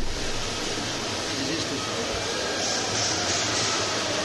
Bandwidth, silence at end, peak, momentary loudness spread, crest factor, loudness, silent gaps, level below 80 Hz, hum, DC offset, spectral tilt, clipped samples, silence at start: 12 kHz; 0 s; -12 dBFS; 5 LU; 14 dB; -25 LUFS; none; -40 dBFS; none; under 0.1%; -2 dB/octave; under 0.1%; 0 s